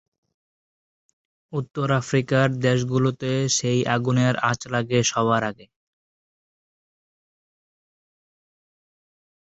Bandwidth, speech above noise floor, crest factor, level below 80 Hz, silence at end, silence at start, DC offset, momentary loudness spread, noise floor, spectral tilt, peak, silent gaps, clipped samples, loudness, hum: 8.2 kHz; over 68 dB; 20 dB; -60 dBFS; 3.9 s; 1.5 s; under 0.1%; 6 LU; under -90 dBFS; -5 dB/octave; -4 dBFS; none; under 0.1%; -22 LUFS; none